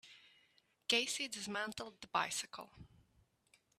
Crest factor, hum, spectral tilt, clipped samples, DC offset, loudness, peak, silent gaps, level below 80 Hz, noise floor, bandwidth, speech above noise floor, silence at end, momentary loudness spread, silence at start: 26 dB; none; -1 dB/octave; under 0.1%; under 0.1%; -39 LUFS; -18 dBFS; none; -76 dBFS; -75 dBFS; 15 kHz; 34 dB; 0.95 s; 18 LU; 0.05 s